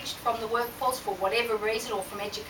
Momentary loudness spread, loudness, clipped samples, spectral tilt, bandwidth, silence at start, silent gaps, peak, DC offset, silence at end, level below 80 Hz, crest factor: 6 LU; -29 LUFS; under 0.1%; -2.5 dB/octave; 19.5 kHz; 0 s; none; -14 dBFS; under 0.1%; 0 s; -58 dBFS; 16 dB